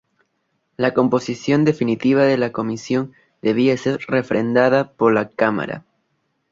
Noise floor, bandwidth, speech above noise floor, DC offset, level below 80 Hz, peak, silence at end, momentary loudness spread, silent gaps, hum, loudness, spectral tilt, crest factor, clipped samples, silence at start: -70 dBFS; 7.6 kHz; 52 dB; under 0.1%; -60 dBFS; -2 dBFS; 0.7 s; 9 LU; none; none; -19 LUFS; -6.5 dB/octave; 18 dB; under 0.1%; 0.8 s